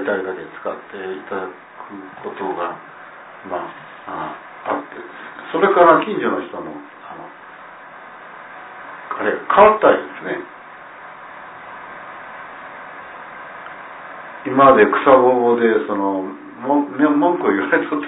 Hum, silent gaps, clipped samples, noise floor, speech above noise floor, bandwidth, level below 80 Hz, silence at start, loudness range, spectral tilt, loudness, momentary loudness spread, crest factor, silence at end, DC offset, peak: none; none; under 0.1%; -39 dBFS; 22 dB; 4 kHz; -58 dBFS; 0 s; 17 LU; -9.5 dB/octave; -17 LUFS; 25 LU; 20 dB; 0 s; under 0.1%; 0 dBFS